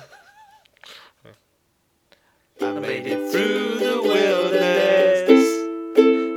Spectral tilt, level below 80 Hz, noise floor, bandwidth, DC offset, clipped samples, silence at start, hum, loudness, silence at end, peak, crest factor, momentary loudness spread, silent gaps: -4.5 dB/octave; -76 dBFS; -67 dBFS; 17.5 kHz; under 0.1%; under 0.1%; 0 s; none; -19 LUFS; 0 s; 0 dBFS; 20 dB; 11 LU; none